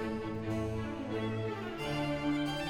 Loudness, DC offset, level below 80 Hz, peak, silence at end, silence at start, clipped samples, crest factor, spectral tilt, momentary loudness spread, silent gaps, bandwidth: -36 LUFS; under 0.1%; -54 dBFS; -22 dBFS; 0 s; 0 s; under 0.1%; 12 dB; -6.5 dB/octave; 5 LU; none; 16.5 kHz